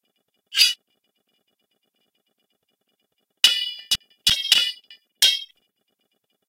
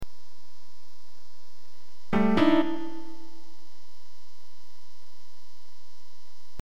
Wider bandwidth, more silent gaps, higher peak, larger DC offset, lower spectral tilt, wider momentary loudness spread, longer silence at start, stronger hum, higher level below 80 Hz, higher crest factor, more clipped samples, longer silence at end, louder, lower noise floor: first, 16.5 kHz vs 13.5 kHz; neither; first, 0 dBFS vs -8 dBFS; second, under 0.1% vs 6%; second, 2.5 dB/octave vs -7 dB/octave; second, 9 LU vs 27 LU; first, 0.5 s vs 0 s; neither; about the same, -60 dBFS vs -56 dBFS; about the same, 26 dB vs 22 dB; neither; second, 1.05 s vs 3.45 s; first, -19 LUFS vs -25 LUFS; first, -73 dBFS vs -59 dBFS